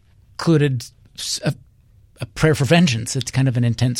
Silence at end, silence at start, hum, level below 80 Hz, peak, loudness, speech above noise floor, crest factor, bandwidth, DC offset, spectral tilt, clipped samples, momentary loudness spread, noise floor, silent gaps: 0 s; 0.4 s; none; -46 dBFS; -2 dBFS; -19 LUFS; 34 dB; 18 dB; 15.5 kHz; under 0.1%; -5.5 dB/octave; under 0.1%; 19 LU; -52 dBFS; none